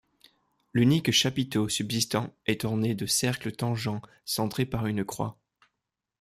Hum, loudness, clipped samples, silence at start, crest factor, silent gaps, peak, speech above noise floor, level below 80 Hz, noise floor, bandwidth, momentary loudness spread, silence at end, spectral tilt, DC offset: none; -28 LUFS; under 0.1%; 0.75 s; 18 dB; none; -10 dBFS; 58 dB; -58 dBFS; -85 dBFS; 15.5 kHz; 9 LU; 0.9 s; -4.5 dB/octave; under 0.1%